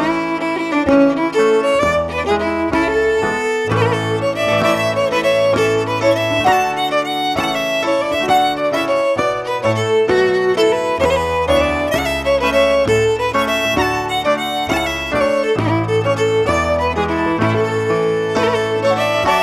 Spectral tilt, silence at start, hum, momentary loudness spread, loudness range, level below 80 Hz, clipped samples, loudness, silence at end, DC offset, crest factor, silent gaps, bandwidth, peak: -5 dB/octave; 0 s; none; 4 LU; 1 LU; -38 dBFS; under 0.1%; -16 LUFS; 0 s; under 0.1%; 14 dB; none; 15.5 kHz; -2 dBFS